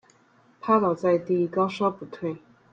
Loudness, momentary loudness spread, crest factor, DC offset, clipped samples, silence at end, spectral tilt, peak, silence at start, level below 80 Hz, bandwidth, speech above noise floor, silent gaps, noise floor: -25 LUFS; 12 LU; 18 dB; under 0.1%; under 0.1%; 0.35 s; -8 dB/octave; -8 dBFS; 0.65 s; -70 dBFS; 7.6 kHz; 36 dB; none; -60 dBFS